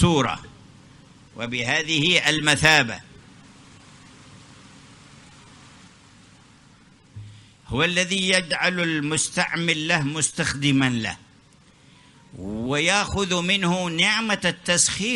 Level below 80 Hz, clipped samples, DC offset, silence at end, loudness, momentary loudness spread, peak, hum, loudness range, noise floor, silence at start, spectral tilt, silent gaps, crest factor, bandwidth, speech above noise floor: -50 dBFS; under 0.1%; under 0.1%; 0 s; -21 LUFS; 13 LU; 0 dBFS; none; 5 LU; -54 dBFS; 0 s; -3 dB/octave; none; 24 dB; 11.5 kHz; 32 dB